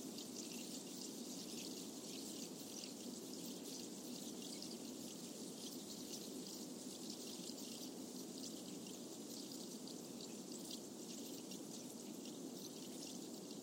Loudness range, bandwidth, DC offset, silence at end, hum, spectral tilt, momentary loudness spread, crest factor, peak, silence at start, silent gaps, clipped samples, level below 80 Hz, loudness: 1 LU; 16.5 kHz; under 0.1%; 0 s; none; -3 dB/octave; 2 LU; 18 dB; -32 dBFS; 0 s; none; under 0.1%; -90 dBFS; -50 LUFS